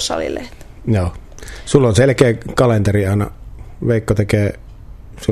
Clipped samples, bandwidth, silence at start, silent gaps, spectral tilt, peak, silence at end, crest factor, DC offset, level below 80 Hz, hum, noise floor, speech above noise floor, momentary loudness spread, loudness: under 0.1%; 14 kHz; 0 s; none; -6 dB/octave; 0 dBFS; 0 s; 16 dB; under 0.1%; -36 dBFS; none; -35 dBFS; 20 dB; 18 LU; -16 LUFS